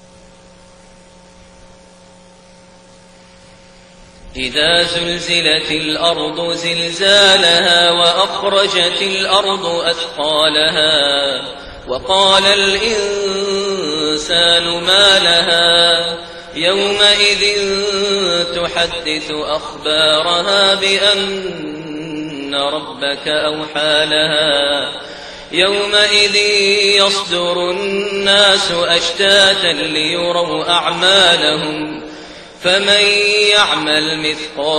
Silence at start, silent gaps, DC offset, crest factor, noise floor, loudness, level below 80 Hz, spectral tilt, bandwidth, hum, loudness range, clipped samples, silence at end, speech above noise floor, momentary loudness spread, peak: 4.25 s; none; under 0.1%; 14 dB; -43 dBFS; -12 LUFS; -46 dBFS; -2 dB/octave; 12.5 kHz; none; 5 LU; under 0.1%; 0 s; 29 dB; 11 LU; 0 dBFS